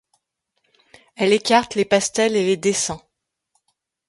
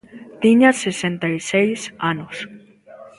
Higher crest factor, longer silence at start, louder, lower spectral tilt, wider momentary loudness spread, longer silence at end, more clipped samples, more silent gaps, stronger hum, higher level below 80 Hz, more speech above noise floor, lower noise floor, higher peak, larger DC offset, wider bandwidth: about the same, 18 dB vs 20 dB; first, 1.2 s vs 0.15 s; about the same, -19 LUFS vs -18 LUFS; second, -3 dB/octave vs -5 dB/octave; second, 6 LU vs 17 LU; first, 1.1 s vs 0.1 s; neither; neither; neither; about the same, -58 dBFS vs -62 dBFS; first, 58 dB vs 25 dB; first, -76 dBFS vs -43 dBFS; second, -4 dBFS vs 0 dBFS; neither; about the same, 11.5 kHz vs 11.5 kHz